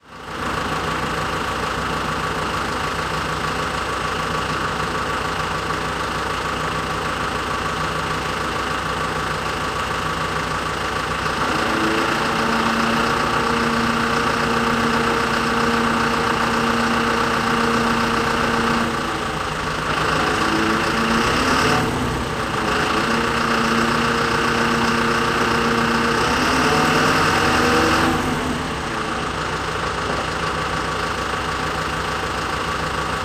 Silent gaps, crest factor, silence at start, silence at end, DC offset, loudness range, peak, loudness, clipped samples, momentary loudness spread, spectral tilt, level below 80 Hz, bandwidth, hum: none; 16 dB; 0.05 s; 0 s; under 0.1%; 5 LU; -4 dBFS; -20 LUFS; under 0.1%; 6 LU; -4 dB/octave; -38 dBFS; 15.5 kHz; none